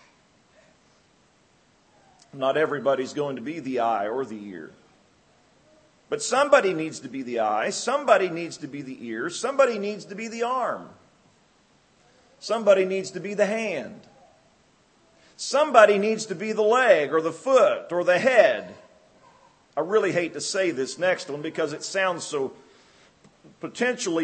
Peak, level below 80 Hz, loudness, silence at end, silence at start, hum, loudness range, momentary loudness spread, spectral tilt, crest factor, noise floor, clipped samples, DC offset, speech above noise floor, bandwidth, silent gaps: 0 dBFS; -76 dBFS; -24 LUFS; 0 s; 2.35 s; none; 8 LU; 15 LU; -3.5 dB/octave; 24 dB; -61 dBFS; under 0.1%; under 0.1%; 38 dB; 8.8 kHz; none